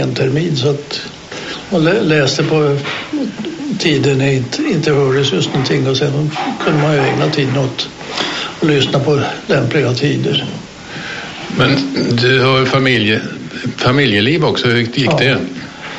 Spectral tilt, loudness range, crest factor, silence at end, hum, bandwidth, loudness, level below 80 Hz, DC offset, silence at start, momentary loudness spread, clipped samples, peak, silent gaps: -5.5 dB/octave; 3 LU; 14 dB; 0 s; none; 8.2 kHz; -14 LUFS; -46 dBFS; under 0.1%; 0 s; 12 LU; under 0.1%; 0 dBFS; none